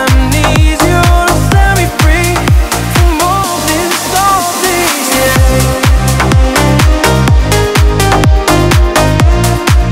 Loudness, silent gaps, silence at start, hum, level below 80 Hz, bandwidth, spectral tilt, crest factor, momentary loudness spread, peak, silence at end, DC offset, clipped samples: -9 LUFS; none; 0 s; none; -12 dBFS; 16.5 kHz; -4.5 dB/octave; 8 dB; 2 LU; 0 dBFS; 0 s; under 0.1%; 0.1%